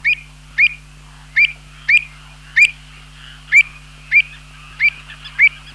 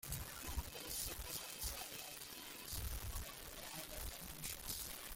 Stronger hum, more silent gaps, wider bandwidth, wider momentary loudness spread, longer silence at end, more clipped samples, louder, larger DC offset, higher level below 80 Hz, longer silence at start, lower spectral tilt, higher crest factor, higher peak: neither; neither; second, 12.5 kHz vs 17 kHz; first, 13 LU vs 5 LU; first, 0.25 s vs 0 s; neither; first, -14 LUFS vs -46 LUFS; neither; first, -44 dBFS vs -54 dBFS; about the same, 0.05 s vs 0 s; second, -0.5 dB/octave vs -2 dB/octave; about the same, 16 dB vs 20 dB; first, -2 dBFS vs -28 dBFS